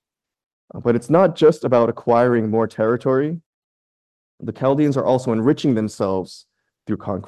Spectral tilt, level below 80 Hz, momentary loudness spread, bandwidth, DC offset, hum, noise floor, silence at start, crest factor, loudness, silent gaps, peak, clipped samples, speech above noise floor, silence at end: -7.5 dB/octave; -56 dBFS; 13 LU; 12 kHz; under 0.1%; none; under -90 dBFS; 0.75 s; 16 dB; -19 LUFS; 3.46-4.38 s; -4 dBFS; under 0.1%; over 72 dB; 0 s